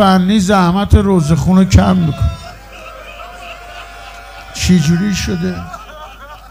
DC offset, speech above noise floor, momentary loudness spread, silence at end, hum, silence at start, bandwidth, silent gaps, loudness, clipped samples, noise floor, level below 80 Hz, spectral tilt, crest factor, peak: under 0.1%; 22 dB; 22 LU; 0.05 s; none; 0 s; 16 kHz; none; -12 LUFS; 0.2%; -33 dBFS; -26 dBFS; -6 dB/octave; 14 dB; 0 dBFS